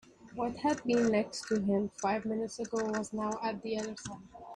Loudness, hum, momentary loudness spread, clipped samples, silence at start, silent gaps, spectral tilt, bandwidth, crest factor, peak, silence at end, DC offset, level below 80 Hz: -33 LUFS; none; 11 LU; under 0.1%; 0.2 s; none; -5 dB/octave; 11 kHz; 18 dB; -16 dBFS; 0 s; under 0.1%; -66 dBFS